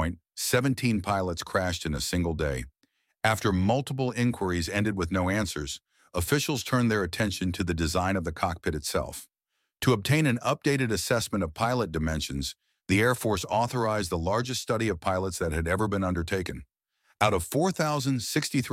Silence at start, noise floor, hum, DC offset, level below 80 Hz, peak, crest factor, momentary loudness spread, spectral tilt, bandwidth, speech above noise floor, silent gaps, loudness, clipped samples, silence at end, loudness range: 0 s; -79 dBFS; none; under 0.1%; -48 dBFS; -6 dBFS; 22 dB; 7 LU; -5 dB/octave; 16.5 kHz; 52 dB; none; -28 LUFS; under 0.1%; 0 s; 2 LU